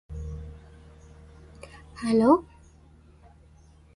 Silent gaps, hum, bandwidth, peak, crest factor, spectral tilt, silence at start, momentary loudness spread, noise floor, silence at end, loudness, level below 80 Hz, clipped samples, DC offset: none; none; 11.5 kHz; -6 dBFS; 22 dB; -7.5 dB/octave; 0.1 s; 27 LU; -54 dBFS; 1.55 s; -24 LUFS; -46 dBFS; under 0.1%; under 0.1%